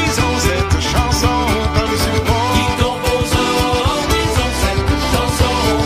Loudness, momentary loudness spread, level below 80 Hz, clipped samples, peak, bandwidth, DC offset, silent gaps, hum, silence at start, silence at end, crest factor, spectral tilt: -15 LUFS; 2 LU; -24 dBFS; under 0.1%; -2 dBFS; 15.5 kHz; under 0.1%; none; none; 0 s; 0 s; 14 dB; -4.5 dB/octave